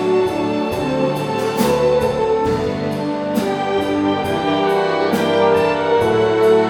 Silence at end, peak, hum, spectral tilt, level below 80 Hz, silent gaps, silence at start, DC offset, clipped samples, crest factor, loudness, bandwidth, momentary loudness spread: 0 s; -2 dBFS; none; -6 dB/octave; -44 dBFS; none; 0 s; under 0.1%; under 0.1%; 14 dB; -17 LUFS; 19 kHz; 5 LU